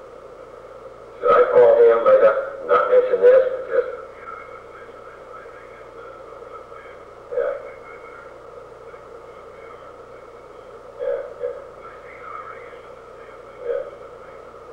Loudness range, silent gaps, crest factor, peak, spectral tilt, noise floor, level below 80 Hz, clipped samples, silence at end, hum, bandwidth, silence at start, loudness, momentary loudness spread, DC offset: 21 LU; none; 16 dB; -6 dBFS; -5.5 dB/octave; -41 dBFS; -58 dBFS; under 0.1%; 0 s; none; 5.2 kHz; 0.05 s; -18 LUFS; 26 LU; under 0.1%